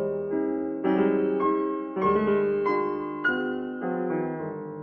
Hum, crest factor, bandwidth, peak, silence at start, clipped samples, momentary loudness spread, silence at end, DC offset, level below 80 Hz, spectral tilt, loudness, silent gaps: none; 16 dB; 5.6 kHz; -10 dBFS; 0 s; under 0.1%; 7 LU; 0 s; under 0.1%; -60 dBFS; -5.5 dB/octave; -26 LUFS; none